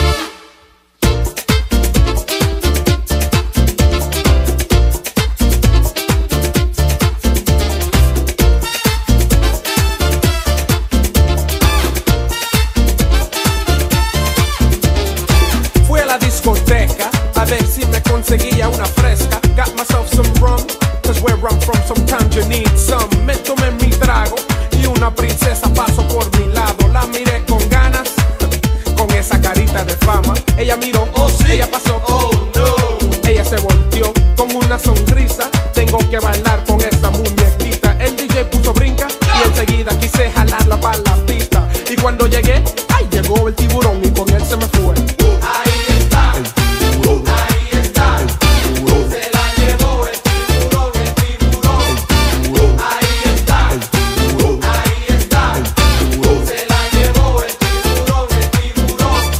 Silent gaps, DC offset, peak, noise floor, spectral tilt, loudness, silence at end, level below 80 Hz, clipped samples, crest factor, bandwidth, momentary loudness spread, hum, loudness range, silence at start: none; under 0.1%; 0 dBFS; -48 dBFS; -5 dB/octave; -14 LUFS; 0 s; -14 dBFS; under 0.1%; 12 dB; 16.5 kHz; 3 LU; none; 1 LU; 0 s